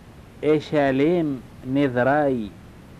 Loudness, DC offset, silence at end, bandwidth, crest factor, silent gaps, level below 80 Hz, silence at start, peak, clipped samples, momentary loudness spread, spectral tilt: -22 LUFS; under 0.1%; 0.05 s; 11.5 kHz; 14 dB; none; -50 dBFS; 0.05 s; -8 dBFS; under 0.1%; 9 LU; -8 dB/octave